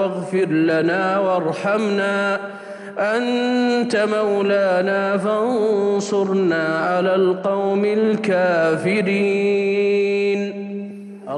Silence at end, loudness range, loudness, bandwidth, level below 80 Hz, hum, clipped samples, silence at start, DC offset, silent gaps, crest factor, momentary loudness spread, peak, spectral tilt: 0 s; 2 LU; -19 LUFS; 10.5 kHz; -80 dBFS; none; under 0.1%; 0 s; under 0.1%; none; 12 dB; 6 LU; -8 dBFS; -6 dB/octave